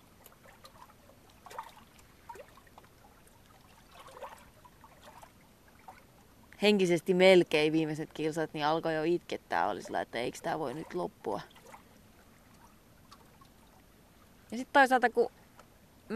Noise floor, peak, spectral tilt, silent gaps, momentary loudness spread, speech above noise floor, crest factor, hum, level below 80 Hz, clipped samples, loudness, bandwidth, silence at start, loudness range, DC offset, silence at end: -60 dBFS; -10 dBFS; -5 dB/octave; none; 24 LU; 31 dB; 22 dB; none; -68 dBFS; under 0.1%; -30 LUFS; 14.5 kHz; 0.65 s; 24 LU; under 0.1%; 0 s